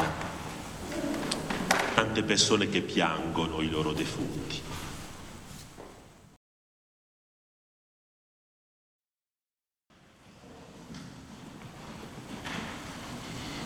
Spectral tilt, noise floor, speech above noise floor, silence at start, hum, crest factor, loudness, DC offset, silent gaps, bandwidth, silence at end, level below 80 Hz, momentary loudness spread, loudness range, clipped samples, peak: -3.5 dB/octave; under -90 dBFS; over 61 dB; 0 s; none; 28 dB; -30 LUFS; under 0.1%; 6.36-9.00 s; over 20 kHz; 0 s; -54 dBFS; 21 LU; 23 LU; under 0.1%; -6 dBFS